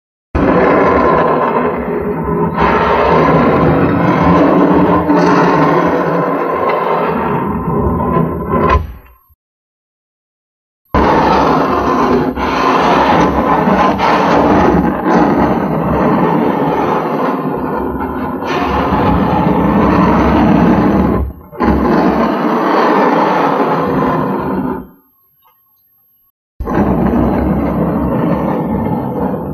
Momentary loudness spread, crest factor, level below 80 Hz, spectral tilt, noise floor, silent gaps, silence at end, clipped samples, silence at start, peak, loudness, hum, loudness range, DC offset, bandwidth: 7 LU; 12 dB; -28 dBFS; -8 dB/octave; -53 dBFS; 9.35-10.85 s, 26.30-26.59 s; 0 s; under 0.1%; 0.35 s; 0 dBFS; -12 LUFS; none; 6 LU; under 0.1%; 13.5 kHz